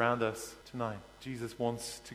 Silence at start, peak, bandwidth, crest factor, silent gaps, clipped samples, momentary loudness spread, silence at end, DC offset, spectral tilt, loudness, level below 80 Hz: 0 s; -12 dBFS; 16.5 kHz; 24 dB; none; under 0.1%; 11 LU; 0 s; under 0.1%; -4.5 dB/octave; -38 LUFS; -64 dBFS